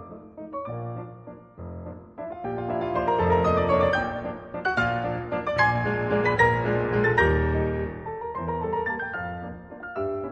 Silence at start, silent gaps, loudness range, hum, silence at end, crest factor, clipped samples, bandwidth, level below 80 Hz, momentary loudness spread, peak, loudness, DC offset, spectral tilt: 0 s; none; 5 LU; none; 0 s; 18 dB; under 0.1%; 8.4 kHz; -40 dBFS; 18 LU; -8 dBFS; -25 LUFS; under 0.1%; -7.5 dB/octave